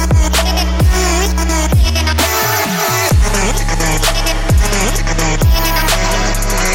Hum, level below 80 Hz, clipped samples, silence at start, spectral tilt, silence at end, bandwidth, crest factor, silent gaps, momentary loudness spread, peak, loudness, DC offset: none; -16 dBFS; under 0.1%; 0 s; -3.5 dB/octave; 0 s; 17 kHz; 10 dB; none; 3 LU; -2 dBFS; -13 LUFS; under 0.1%